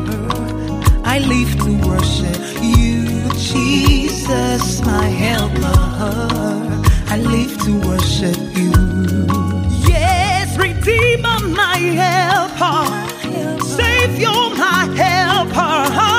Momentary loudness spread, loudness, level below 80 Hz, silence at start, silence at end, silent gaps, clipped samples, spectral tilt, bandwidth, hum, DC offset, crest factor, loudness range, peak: 6 LU; -15 LUFS; -22 dBFS; 0 s; 0 s; none; under 0.1%; -5 dB/octave; 16 kHz; none; under 0.1%; 14 dB; 2 LU; 0 dBFS